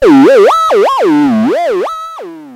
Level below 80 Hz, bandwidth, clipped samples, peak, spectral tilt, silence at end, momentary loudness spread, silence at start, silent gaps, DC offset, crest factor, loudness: -44 dBFS; 15 kHz; under 0.1%; 0 dBFS; -5.5 dB/octave; 0 s; 17 LU; 0 s; none; under 0.1%; 8 dB; -8 LUFS